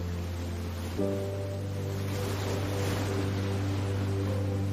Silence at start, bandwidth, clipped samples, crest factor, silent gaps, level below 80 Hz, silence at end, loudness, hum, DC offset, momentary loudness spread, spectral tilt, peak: 0 s; 15.5 kHz; under 0.1%; 14 dB; none; -48 dBFS; 0 s; -32 LUFS; none; under 0.1%; 5 LU; -6.5 dB/octave; -16 dBFS